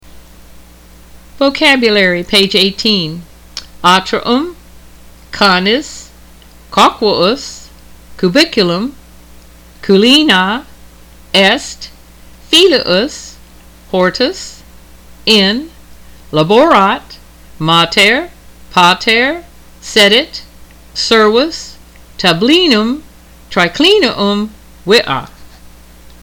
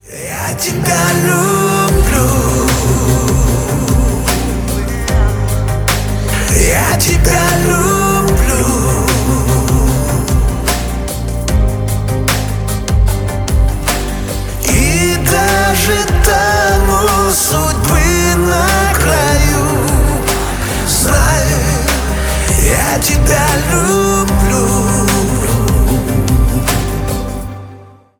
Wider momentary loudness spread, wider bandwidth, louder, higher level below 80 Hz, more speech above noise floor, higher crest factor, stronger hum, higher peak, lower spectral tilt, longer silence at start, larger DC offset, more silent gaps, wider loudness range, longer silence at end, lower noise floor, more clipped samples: first, 19 LU vs 6 LU; about the same, 19.5 kHz vs over 20 kHz; about the same, -10 LUFS vs -12 LUFS; second, -40 dBFS vs -16 dBFS; first, 28 dB vs 24 dB; about the same, 14 dB vs 12 dB; neither; about the same, 0 dBFS vs 0 dBFS; about the same, -4 dB/octave vs -4.5 dB/octave; about the same, 0.15 s vs 0.05 s; neither; neither; about the same, 3 LU vs 4 LU; first, 0.75 s vs 0.3 s; about the same, -38 dBFS vs -36 dBFS; neither